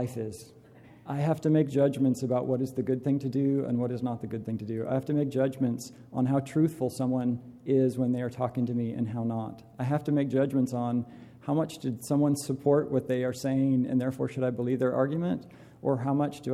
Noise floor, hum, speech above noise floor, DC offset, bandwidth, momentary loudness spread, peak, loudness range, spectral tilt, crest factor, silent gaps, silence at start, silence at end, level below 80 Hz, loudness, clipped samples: -53 dBFS; none; 25 dB; under 0.1%; 15 kHz; 9 LU; -12 dBFS; 2 LU; -8 dB/octave; 16 dB; none; 0 s; 0 s; -66 dBFS; -29 LUFS; under 0.1%